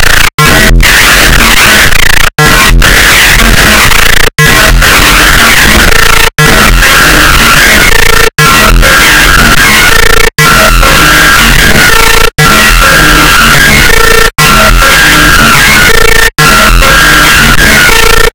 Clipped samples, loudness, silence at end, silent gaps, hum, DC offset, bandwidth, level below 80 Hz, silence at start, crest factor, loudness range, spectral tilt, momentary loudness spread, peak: 30%; -1 LUFS; 0.05 s; 0.34-0.38 s; none; under 0.1%; over 20 kHz; -10 dBFS; 0 s; 2 dB; 1 LU; -2.5 dB/octave; 2 LU; 0 dBFS